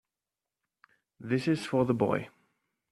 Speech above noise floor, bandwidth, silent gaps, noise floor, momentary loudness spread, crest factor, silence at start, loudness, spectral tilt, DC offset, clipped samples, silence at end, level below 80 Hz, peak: over 61 dB; 13 kHz; none; under -90 dBFS; 16 LU; 20 dB; 1.2 s; -30 LUFS; -7 dB/octave; under 0.1%; under 0.1%; 0.65 s; -70 dBFS; -12 dBFS